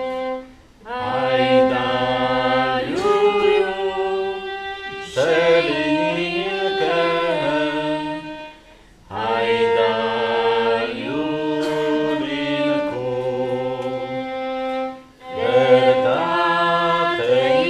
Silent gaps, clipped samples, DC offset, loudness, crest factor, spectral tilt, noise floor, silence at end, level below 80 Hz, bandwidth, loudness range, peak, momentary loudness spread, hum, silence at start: none; under 0.1%; under 0.1%; -20 LUFS; 18 dB; -5.5 dB/octave; -47 dBFS; 0 s; -52 dBFS; 10.5 kHz; 4 LU; -2 dBFS; 11 LU; none; 0 s